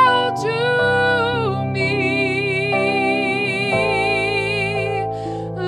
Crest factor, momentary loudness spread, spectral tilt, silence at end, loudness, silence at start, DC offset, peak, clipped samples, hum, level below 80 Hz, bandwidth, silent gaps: 16 dB; 5 LU; -5.5 dB/octave; 0 s; -18 LUFS; 0 s; under 0.1%; -4 dBFS; under 0.1%; none; -48 dBFS; 12 kHz; none